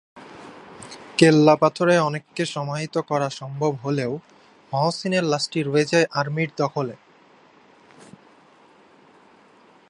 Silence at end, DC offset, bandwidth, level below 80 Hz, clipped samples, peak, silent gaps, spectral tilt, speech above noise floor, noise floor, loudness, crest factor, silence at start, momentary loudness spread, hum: 2.95 s; under 0.1%; 11 kHz; -68 dBFS; under 0.1%; 0 dBFS; none; -5.5 dB/octave; 33 dB; -53 dBFS; -22 LUFS; 22 dB; 0.15 s; 21 LU; none